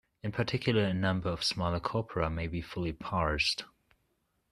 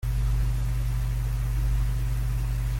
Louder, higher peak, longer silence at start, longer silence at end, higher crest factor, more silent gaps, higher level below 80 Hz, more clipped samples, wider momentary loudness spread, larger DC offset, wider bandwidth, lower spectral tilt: second, -32 LUFS vs -29 LUFS; about the same, -14 dBFS vs -16 dBFS; first, 0.25 s vs 0 s; first, 0.85 s vs 0 s; first, 20 dB vs 8 dB; neither; second, -50 dBFS vs -26 dBFS; neither; first, 8 LU vs 2 LU; neither; second, 13.5 kHz vs 16.5 kHz; about the same, -5.5 dB/octave vs -6 dB/octave